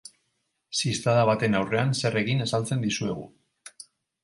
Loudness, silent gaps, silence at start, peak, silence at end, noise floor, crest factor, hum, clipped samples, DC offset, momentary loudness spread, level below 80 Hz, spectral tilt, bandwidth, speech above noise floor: -25 LUFS; none; 0.7 s; -8 dBFS; 0.55 s; -76 dBFS; 20 dB; none; under 0.1%; under 0.1%; 11 LU; -60 dBFS; -5 dB/octave; 11.5 kHz; 51 dB